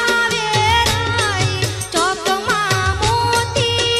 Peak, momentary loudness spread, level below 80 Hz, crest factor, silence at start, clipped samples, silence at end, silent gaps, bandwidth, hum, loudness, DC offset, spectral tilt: -4 dBFS; 4 LU; -34 dBFS; 14 dB; 0 s; under 0.1%; 0 s; none; 14 kHz; none; -16 LUFS; under 0.1%; -3 dB/octave